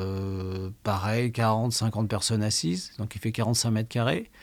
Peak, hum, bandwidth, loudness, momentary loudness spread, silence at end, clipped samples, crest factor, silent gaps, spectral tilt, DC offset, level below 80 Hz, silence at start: -12 dBFS; none; 16.5 kHz; -27 LUFS; 8 LU; 0.15 s; under 0.1%; 16 dB; none; -4.5 dB/octave; under 0.1%; -58 dBFS; 0 s